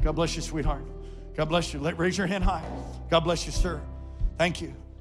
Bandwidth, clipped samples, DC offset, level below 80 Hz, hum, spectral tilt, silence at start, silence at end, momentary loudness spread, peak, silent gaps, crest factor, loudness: 12.5 kHz; under 0.1%; under 0.1%; -32 dBFS; none; -5 dB/octave; 0 s; 0 s; 13 LU; -10 dBFS; none; 18 dB; -29 LUFS